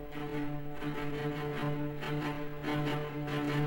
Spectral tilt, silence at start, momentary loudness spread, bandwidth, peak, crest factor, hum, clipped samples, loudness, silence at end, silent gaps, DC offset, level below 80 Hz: -7 dB/octave; 0 s; 5 LU; 16 kHz; -22 dBFS; 14 dB; none; under 0.1%; -36 LUFS; 0 s; none; under 0.1%; -50 dBFS